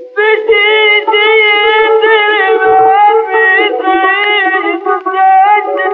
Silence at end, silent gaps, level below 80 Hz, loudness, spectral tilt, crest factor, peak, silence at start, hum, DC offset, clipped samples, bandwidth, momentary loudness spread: 0 s; none; -56 dBFS; -8 LUFS; -4.5 dB/octave; 8 dB; 0 dBFS; 0 s; none; under 0.1%; under 0.1%; 4.5 kHz; 4 LU